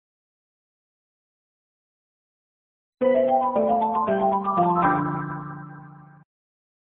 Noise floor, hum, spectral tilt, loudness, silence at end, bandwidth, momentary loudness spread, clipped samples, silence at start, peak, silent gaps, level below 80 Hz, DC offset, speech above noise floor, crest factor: -45 dBFS; none; -11.5 dB/octave; -22 LUFS; 0.9 s; 4 kHz; 15 LU; under 0.1%; 3 s; -10 dBFS; none; -60 dBFS; under 0.1%; 25 dB; 16 dB